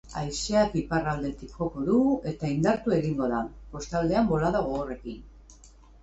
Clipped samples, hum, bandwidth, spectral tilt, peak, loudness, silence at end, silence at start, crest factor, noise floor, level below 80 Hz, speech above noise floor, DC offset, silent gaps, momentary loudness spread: under 0.1%; none; 8.2 kHz; -6 dB/octave; -12 dBFS; -27 LUFS; 0.35 s; 0.05 s; 16 dB; -52 dBFS; -46 dBFS; 25 dB; under 0.1%; none; 12 LU